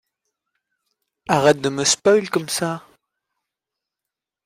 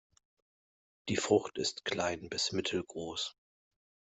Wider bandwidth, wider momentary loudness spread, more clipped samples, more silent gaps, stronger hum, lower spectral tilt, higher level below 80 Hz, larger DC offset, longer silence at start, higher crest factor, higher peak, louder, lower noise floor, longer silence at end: first, 16 kHz vs 8.2 kHz; first, 12 LU vs 9 LU; neither; neither; neither; about the same, -3.5 dB/octave vs -3.5 dB/octave; first, -62 dBFS vs -70 dBFS; neither; first, 1.3 s vs 1.05 s; about the same, 20 dB vs 24 dB; first, -2 dBFS vs -14 dBFS; first, -18 LUFS vs -34 LUFS; second, -86 dBFS vs under -90 dBFS; first, 1.65 s vs 0.8 s